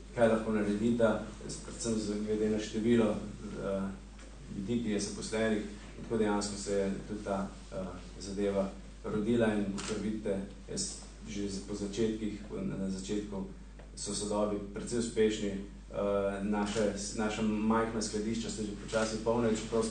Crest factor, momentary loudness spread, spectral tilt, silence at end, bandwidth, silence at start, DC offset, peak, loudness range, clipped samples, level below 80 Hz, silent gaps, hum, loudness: 18 dB; 12 LU; -5 dB/octave; 0 s; 9.6 kHz; 0 s; under 0.1%; -14 dBFS; 4 LU; under 0.1%; -50 dBFS; none; none; -34 LUFS